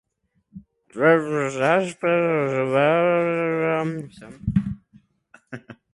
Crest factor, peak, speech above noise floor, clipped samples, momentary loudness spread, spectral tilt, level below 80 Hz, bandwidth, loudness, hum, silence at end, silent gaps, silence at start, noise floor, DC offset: 18 dB; -6 dBFS; 48 dB; under 0.1%; 22 LU; -7 dB/octave; -50 dBFS; 11.5 kHz; -21 LUFS; none; 0.2 s; none; 0.55 s; -69 dBFS; under 0.1%